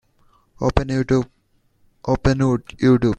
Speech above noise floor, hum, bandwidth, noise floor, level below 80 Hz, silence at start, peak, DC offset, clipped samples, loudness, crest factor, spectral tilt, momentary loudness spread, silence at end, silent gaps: 42 dB; none; 9 kHz; -60 dBFS; -34 dBFS; 0.6 s; 0 dBFS; under 0.1%; under 0.1%; -20 LUFS; 20 dB; -7.5 dB/octave; 7 LU; 0.05 s; none